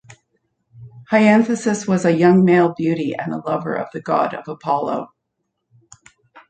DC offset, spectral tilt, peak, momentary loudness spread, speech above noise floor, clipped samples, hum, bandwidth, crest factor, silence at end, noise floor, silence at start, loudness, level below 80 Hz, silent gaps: under 0.1%; -6.5 dB/octave; -2 dBFS; 12 LU; 58 dB; under 0.1%; none; 9.2 kHz; 18 dB; 1.45 s; -75 dBFS; 0.75 s; -18 LUFS; -64 dBFS; none